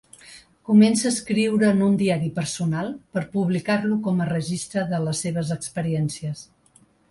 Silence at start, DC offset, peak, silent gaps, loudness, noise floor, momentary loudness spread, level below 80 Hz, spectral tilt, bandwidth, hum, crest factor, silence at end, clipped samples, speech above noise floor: 0.25 s; under 0.1%; -6 dBFS; none; -23 LUFS; -58 dBFS; 10 LU; -58 dBFS; -5.5 dB/octave; 11.5 kHz; none; 18 dB; 0.65 s; under 0.1%; 36 dB